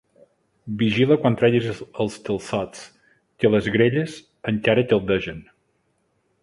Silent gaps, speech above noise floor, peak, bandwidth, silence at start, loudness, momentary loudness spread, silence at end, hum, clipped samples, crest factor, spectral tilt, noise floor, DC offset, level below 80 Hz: none; 48 dB; -4 dBFS; 11.5 kHz; 0.65 s; -21 LUFS; 15 LU; 1 s; none; under 0.1%; 20 dB; -6.5 dB/octave; -68 dBFS; under 0.1%; -52 dBFS